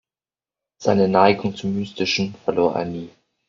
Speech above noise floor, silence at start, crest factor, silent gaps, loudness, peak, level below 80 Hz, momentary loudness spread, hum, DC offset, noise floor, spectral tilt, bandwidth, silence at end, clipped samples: over 70 dB; 0.8 s; 20 dB; none; -20 LUFS; -2 dBFS; -58 dBFS; 12 LU; none; under 0.1%; under -90 dBFS; -4.5 dB/octave; 7.6 kHz; 0.4 s; under 0.1%